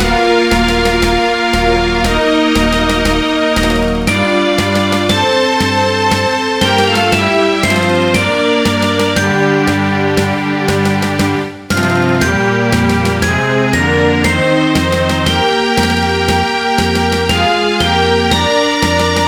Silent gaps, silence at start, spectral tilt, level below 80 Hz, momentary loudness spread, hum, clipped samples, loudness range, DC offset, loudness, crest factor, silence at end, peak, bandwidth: none; 0 s; -4.5 dB/octave; -26 dBFS; 2 LU; none; under 0.1%; 2 LU; 0.3%; -12 LUFS; 12 dB; 0 s; 0 dBFS; 18 kHz